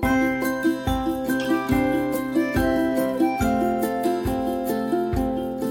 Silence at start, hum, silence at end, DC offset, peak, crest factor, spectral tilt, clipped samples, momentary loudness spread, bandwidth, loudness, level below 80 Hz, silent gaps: 0 s; none; 0 s; under 0.1%; -8 dBFS; 14 dB; -6 dB/octave; under 0.1%; 4 LU; 17 kHz; -23 LUFS; -38 dBFS; none